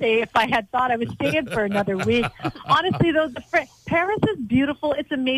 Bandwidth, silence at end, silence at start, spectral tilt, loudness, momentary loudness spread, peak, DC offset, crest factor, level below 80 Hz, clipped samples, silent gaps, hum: 16 kHz; 0 s; 0 s; -6 dB/octave; -22 LUFS; 4 LU; -8 dBFS; under 0.1%; 14 dB; -50 dBFS; under 0.1%; none; none